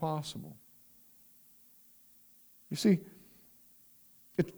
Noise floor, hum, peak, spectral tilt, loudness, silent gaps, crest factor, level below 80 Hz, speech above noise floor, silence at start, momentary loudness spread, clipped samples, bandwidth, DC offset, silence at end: -61 dBFS; none; -14 dBFS; -6 dB/octave; -33 LUFS; none; 22 dB; -72 dBFS; 29 dB; 0 s; 28 LU; under 0.1%; over 20 kHz; under 0.1%; 0 s